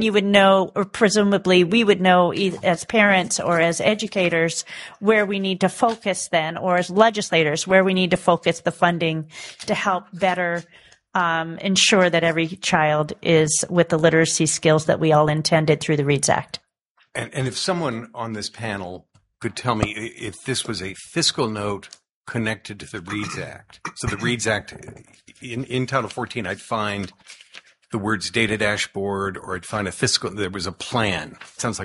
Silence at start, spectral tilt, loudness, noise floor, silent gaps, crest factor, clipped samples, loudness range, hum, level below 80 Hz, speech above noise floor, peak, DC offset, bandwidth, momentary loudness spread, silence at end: 0 s; -4 dB/octave; -20 LUFS; -64 dBFS; 16.89-16.95 s, 22.11-22.24 s; 20 dB; under 0.1%; 9 LU; none; -52 dBFS; 43 dB; 0 dBFS; under 0.1%; 11.5 kHz; 14 LU; 0 s